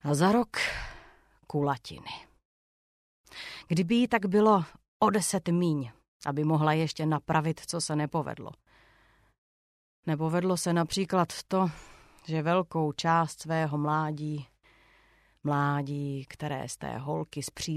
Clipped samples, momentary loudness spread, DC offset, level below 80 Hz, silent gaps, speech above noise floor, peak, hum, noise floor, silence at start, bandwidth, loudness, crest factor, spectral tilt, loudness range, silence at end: under 0.1%; 15 LU; under 0.1%; -58 dBFS; 2.45-3.24 s, 4.88-5.00 s, 6.08-6.20 s, 9.38-10.03 s; 35 dB; -10 dBFS; none; -64 dBFS; 0.05 s; 14.5 kHz; -29 LUFS; 20 dB; -5.5 dB/octave; 6 LU; 0 s